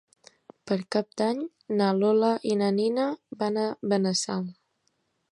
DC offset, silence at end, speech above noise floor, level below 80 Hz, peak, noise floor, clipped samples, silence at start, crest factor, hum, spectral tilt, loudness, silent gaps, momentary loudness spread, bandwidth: under 0.1%; 0.8 s; 48 dB; -76 dBFS; -10 dBFS; -74 dBFS; under 0.1%; 0.65 s; 16 dB; none; -5.5 dB/octave; -27 LUFS; none; 9 LU; 11 kHz